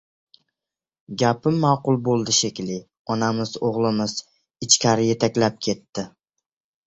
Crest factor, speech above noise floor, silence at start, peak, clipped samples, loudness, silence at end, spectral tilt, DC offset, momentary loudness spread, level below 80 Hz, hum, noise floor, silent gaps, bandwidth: 22 dB; 68 dB; 1.1 s; -2 dBFS; under 0.1%; -21 LUFS; 0.8 s; -4 dB/octave; under 0.1%; 15 LU; -58 dBFS; none; -89 dBFS; 2.99-3.05 s; 8.4 kHz